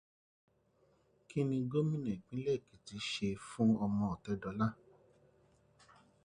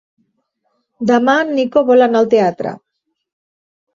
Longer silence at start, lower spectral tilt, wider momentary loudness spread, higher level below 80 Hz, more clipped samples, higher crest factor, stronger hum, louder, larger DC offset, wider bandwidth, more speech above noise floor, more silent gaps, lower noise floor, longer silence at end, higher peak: first, 1.3 s vs 1 s; about the same, -7 dB/octave vs -6 dB/octave; second, 8 LU vs 11 LU; about the same, -66 dBFS vs -62 dBFS; neither; about the same, 18 dB vs 14 dB; neither; second, -37 LUFS vs -13 LUFS; neither; first, 10.5 kHz vs 7.4 kHz; second, 37 dB vs 55 dB; neither; first, -73 dBFS vs -68 dBFS; first, 1.5 s vs 1.15 s; second, -20 dBFS vs -2 dBFS